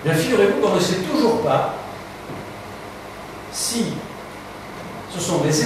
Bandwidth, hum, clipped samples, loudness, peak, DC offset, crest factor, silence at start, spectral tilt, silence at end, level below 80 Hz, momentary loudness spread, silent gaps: 15.5 kHz; 50 Hz at -45 dBFS; under 0.1%; -20 LUFS; -4 dBFS; under 0.1%; 18 dB; 0 s; -4.5 dB/octave; 0 s; -52 dBFS; 18 LU; none